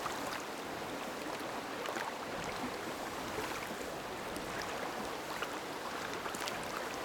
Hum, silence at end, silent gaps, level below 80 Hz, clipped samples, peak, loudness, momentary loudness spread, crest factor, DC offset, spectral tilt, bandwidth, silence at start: none; 0 s; none; -64 dBFS; under 0.1%; -16 dBFS; -40 LUFS; 2 LU; 24 dB; under 0.1%; -3 dB/octave; over 20 kHz; 0 s